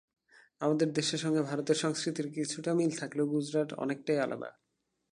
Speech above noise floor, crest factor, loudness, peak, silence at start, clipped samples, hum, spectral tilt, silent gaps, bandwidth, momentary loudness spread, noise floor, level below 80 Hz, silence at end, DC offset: 50 dB; 18 dB; -32 LUFS; -14 dBFS; 0.6 s; under 0.1%; none; -5 dB/octave; none; 11.5 kHz; 5 LU; -82 dBFS; -80 dBFS; 0.6 s; under 0.1%